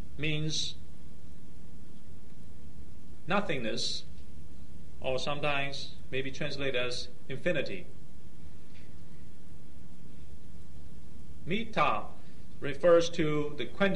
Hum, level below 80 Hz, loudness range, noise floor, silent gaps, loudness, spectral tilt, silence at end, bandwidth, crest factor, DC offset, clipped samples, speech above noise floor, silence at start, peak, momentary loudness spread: none; -56 dBFS; 13 LU; -53 dBFS; none; -32 LUFS; -4.5 dB/octave; 0 s; 11.5 kHz; 22 dB; 4%; under 0.1%; 21 dB; 0 s; -12 dBFS; 24 LU